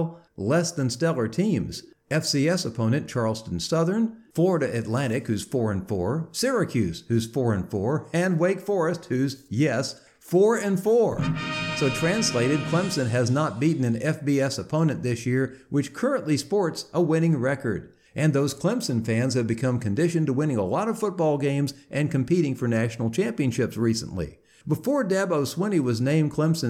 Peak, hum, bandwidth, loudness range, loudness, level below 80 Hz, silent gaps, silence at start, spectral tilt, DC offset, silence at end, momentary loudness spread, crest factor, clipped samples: -10 dBFS; none; 15.5 kHz; 2 LU; -25 LUFS; -56 dBFS; none; 0 s; -6 dB/octave; under 0.1%; 0 s; 5 LU; 14 dB; under 0.1%